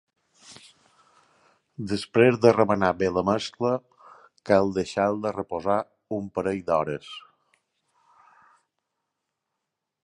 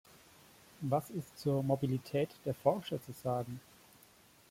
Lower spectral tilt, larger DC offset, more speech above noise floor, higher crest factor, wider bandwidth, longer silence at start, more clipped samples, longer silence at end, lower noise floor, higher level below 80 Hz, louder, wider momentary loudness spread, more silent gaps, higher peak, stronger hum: about the same, -6.5 dB/octave vs -7 dB/octave; neither; first, 60 dB vs 28 dB; about the same, 24 dB vs 22 dB; second, 11 kHz vs 16.5 kHz; second, 0.5 s vs 0.8 s; neither; first, 2.85 s vs 0.9 s; first, -83 dBFS vs -63 dBFS; first, -58 dBFS vs -70 dBFS; first, -24 LUFS vs -36 LUFS; first, 15 LU vs 11 LU; neither; first, -2 dBFS vs -16 dBFS; neither